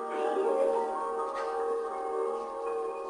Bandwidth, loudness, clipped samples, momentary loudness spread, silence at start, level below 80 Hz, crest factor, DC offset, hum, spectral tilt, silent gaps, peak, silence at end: 10.5 kHz; -32 LUFS; under 0.1%; 6 LU; 0 s; -70 dBFS; 14 dB; under 0.1%; none; -3.5 dB/octave; none; -18 dBFS; 0 s